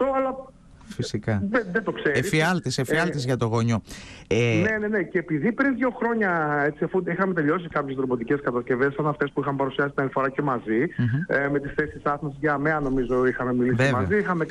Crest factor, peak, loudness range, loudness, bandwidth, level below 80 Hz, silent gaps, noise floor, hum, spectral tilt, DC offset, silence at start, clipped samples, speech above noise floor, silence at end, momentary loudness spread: 14 dB; -10 dBFS; 1 LU; -24 LUFS; 13 kHz; -50 dBFS; none; -44 dBFS; none; -6.5 dB/octave; under 0.1%; 0 s; under 0.1%; 20 dB; 0 s; 5 LU